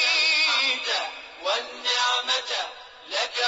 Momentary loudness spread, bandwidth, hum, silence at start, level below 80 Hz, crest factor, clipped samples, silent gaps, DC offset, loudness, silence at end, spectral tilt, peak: 13 LU; 7.8 kHz; none; 0 s; -70 dBFS; 16 dB; under 0.1%; none; under 0.1%; -23 LUFS; 0 s; 2.5 dB/octave; -10 dBFS